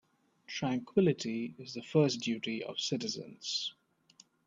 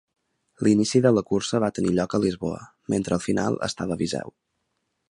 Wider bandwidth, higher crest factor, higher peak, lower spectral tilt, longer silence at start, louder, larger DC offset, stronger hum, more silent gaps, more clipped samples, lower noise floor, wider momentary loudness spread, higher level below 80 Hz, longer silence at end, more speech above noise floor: second, 7.8 kHz vs 11.5 kHz; about the same, 22 dB vs 18 dB; second, -14 dBFS vs -6 dBFS; about the same, -5 dB/octave vs -5.5 dB/octave; about the same, 0.5 s vs 0.6 s; second, -34 LUFS vs -24 LUFS; neither; neither; neither; neither; second, -64 dBFS vs -76 dBFS; about the same, 11 LU vs 12 LU; second, -76 dBFS vs -54 dBFS; about the same, 0.75 s vs 0.8 s; second, 31 dB vs 53 dB